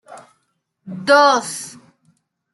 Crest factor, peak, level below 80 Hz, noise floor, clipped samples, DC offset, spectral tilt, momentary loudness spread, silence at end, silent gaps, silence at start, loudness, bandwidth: 18 dB; -2 dBFS; -76 dBFS; -70 dBFS; under 0.1%; under 0.1%; -2.5 dB/octave; 23 LU; 0.85 s; none; 0.1 s; -15 LUFS; 12 kHz